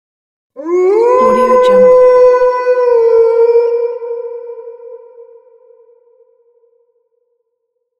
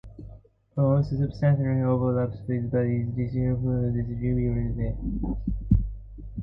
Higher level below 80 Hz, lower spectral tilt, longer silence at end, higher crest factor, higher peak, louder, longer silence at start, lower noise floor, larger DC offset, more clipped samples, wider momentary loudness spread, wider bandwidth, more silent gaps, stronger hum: second, -50 dBFS vs -36 dBFS; second, -6 dB/octave vs -12 dB/octave; first, 2.8 s vs 0 s; about the same, 12 dB vs 16 dB; first, 0 dBFS vs -8 dBFS; first, -9 LUFS vs -26 LUFS; first, 0.55 s vs 0.05 s; first, -69 dBFS vs -48 dBFS; neither; neither; first, 20 LU vs 9 LU; first, 7 kHz vs 5.6 kHz; neither; neither